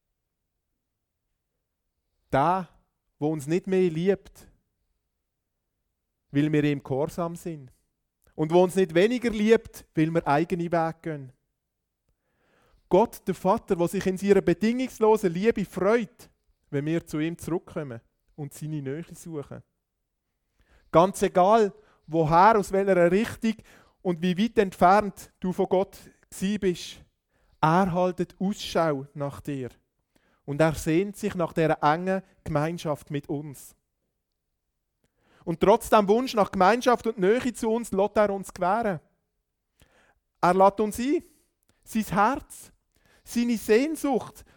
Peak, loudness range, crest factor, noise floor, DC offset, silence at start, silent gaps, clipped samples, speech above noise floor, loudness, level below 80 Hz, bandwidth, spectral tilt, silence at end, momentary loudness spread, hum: -4 dBFS; 8 LU; 22 dB; -82 dBFS; under 0.1%; 2.3 s; none; under 0.1%; 57 dB; -25 LUFS; -54 dBFS; 19 kHz; -6.5 dB/octave; 0.15 s; 15 LU; none